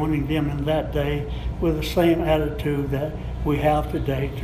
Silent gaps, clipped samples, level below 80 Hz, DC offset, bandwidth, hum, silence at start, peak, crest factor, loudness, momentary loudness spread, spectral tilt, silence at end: none; under 0.1%; -32 dBFS; under 0.1%; 15.5 kHz; none; 0 s; -6 dBFS; 16 dB; -23 LUFS; 7 LU; -7.5 dB/octave; 0 s